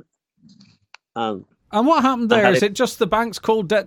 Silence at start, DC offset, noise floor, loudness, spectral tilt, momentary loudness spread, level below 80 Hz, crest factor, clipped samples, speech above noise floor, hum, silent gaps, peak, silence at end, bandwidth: 1.15 s; under 0.1%; -55 dBFS; -19 LUFS; -5 dB/octave; 12 LU; -56 dBFS; 20 dB; under 0.1%; 37 dB; none; none; 0 dBFS; 0 s; 18 kHz